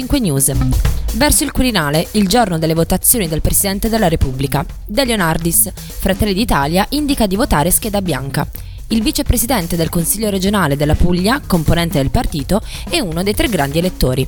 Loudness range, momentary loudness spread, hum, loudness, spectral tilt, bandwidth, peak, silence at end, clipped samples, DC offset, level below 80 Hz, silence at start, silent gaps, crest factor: 2 LU; 7 LU; none; -15 LUFS; -4.5 dB/octave; 19.5 kHz; 0 dBFS; 0 s; under 0.1%; under 0.1%; -24 dBFS; 0 s; none; 14 dB